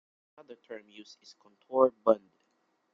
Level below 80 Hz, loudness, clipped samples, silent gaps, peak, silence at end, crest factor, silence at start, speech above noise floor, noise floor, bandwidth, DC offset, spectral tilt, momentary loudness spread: -76 dBFS; -28 LUFS; under 0.1%; none; -10 dBFS; 0.75 s; 24 dB; 0.5 s; 44 dB; -75 dBFS; 7.2 kHz; under 0.1%; -6.5 dB/octave; 26 LU